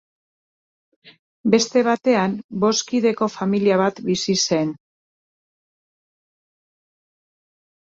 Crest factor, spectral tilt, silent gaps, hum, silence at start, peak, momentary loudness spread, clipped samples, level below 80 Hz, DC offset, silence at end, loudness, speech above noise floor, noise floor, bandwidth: 20 dB; -4.5 dB/octave; 1.19-1.44 s, 2.44-2.49 s; none; 1.05 s; -2 dBFS; 6 LU; under 0.1%; -64 dBFS; under 0.1%; 3.1 s; -20 LUFS; over 71 dB; under -90 dBFS; 7.8 kHz